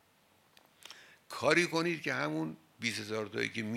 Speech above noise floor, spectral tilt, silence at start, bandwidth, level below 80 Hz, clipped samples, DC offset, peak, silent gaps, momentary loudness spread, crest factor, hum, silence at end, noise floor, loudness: 35 dB; -4 dB/octave; 0.85 s; 16 kHz; -78 dBFS; under 0.1%; under 0.1%; -10 dBFS; none; 23 LU; 26 dB; none; 0 s; -68 dBFS; -33 LUFS